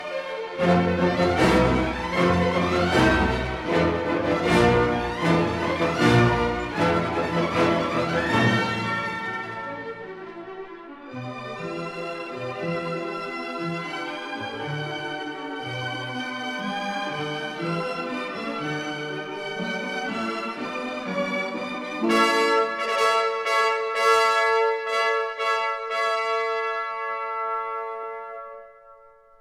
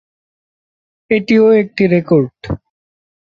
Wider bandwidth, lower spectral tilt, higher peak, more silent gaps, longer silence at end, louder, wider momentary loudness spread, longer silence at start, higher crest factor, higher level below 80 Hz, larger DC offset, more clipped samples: first, 15 kHz vs 7 kHz; second, -5.5 dB/octave vs -8.5 dB/octave; second, -6 dBFS vs -2 dBFS; neither; second, 0.45 s vs 0.65 s; second, -24 LUFS vs -13 LUFS; second, 13 LU vs 16 LU; second, 0 s vs 1.1 s; first, 20 dB vs 14 dB; about the same, -44 dBFS vs -42 dBFS; neither; neither